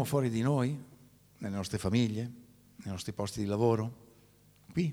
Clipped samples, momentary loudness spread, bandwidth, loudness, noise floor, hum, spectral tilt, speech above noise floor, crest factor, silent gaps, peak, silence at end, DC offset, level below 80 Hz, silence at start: under 0.1%; 13 LU; 17 kHz; -33 LUFS; -62 dBFS; 50 Hz at -55 dBFS; -6.5 dB/octave; 31 dB; 18 dB; none; -14 dBFS; 0 s; under 0.1%; -62 dBFS; 0 s